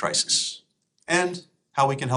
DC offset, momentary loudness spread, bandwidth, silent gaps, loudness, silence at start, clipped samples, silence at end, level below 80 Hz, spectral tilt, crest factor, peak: under 0.1%; 20 LU; 11.5 kHz; none; -24 LUFS; 0 s; under 0.1%; 0 s; -68 dBFS; -2.5 dB/octave; 18 dB; -8 dBFS